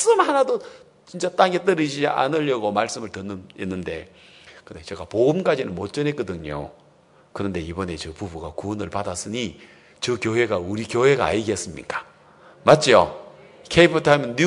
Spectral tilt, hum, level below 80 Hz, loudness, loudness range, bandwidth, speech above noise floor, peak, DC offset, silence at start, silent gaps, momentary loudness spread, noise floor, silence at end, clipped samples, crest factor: -4.5 dB/octave; none; -54 dBFS; -22 LUFS; 9 LU; 11 kHz; 33 dB; 0 dBFS; under 0.1%; 0 s; none; 16 LU; -55 dBFS; 0 s; under 0.1%; 22 dB